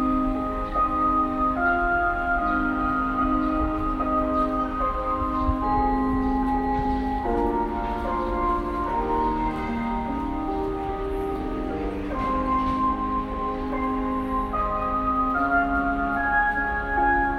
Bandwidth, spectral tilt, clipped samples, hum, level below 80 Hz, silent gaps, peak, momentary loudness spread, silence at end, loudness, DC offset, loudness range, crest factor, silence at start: 12 kHz; -8 dB/octave; under 0.1%; none; -34 dBFS; none; -10 dBFS; 6 LU; 0 s; -25 LUFS; under 0.1%; 4 LU; 14 dB; 0 s